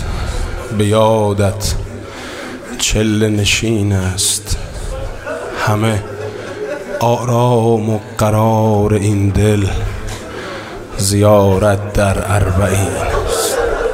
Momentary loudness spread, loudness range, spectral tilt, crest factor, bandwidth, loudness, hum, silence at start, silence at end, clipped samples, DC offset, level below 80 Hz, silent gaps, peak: 13 LU; 3 LU; -5 dB/octave; 14 dB; 16 kHz; -15 LUFS; none; 0 s; 0 s; under 0.1%; under 0.1%; -28 dBFS; none; 0 dBFS